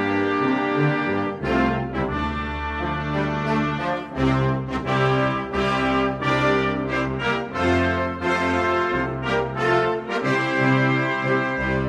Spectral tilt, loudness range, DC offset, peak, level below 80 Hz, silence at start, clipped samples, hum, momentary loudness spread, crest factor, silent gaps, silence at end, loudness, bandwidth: -7 dB/octave; 2 LU; under 0.1%; -6 dBFS; -40 dBFS; 0 s; under 0.1%; none; 5 LU; 16 dB; none; 0 s; -22 LUFS; 10 kHz